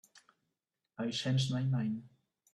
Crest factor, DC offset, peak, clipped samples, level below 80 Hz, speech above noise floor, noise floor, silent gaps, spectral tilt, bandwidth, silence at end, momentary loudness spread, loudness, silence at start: 16 dB; under 0.1%; -22 dBFS; under 0.1%; -72 dBFS; 54 dB; -88 dBFS; none; -6 dB/octave; 11 kHz; 0.45 s; 11 LU; -35 LUFS; 1 s